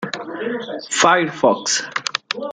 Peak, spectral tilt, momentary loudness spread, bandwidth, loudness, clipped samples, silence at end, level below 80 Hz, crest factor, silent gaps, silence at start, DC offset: 0 dBFS; -2 dB/octave; 12 LU; 10.5 kHz; -19 LUFS; under 0.1%; 0 s; -64 dBFS; 20 dB; none; 0 s; under 0.1%